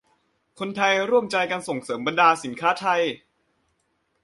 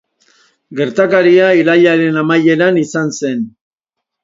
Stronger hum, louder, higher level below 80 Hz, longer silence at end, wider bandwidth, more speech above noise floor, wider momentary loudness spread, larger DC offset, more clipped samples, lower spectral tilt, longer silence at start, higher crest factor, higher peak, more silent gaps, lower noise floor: neither; second, -22 LUFS vs -11 LUFS; second, -70 dBFS vs -62 dBFS; first, 1.05 s vs 0.75 s; first, 11.5 kHz vs 7.8 kHz; second, 49 dB vs 67 dB; about the same, 11 LU vs 11 LU; neither; neither; second, -3.5 dB/octave vs -6 dB/octave; about the same, 0.6 s vs 0.7 s; first, 20 dB vs 12 dB; second, -4 dBFS vs 0 dBFS; neither; second, -71 dBFS vs -78 dBFS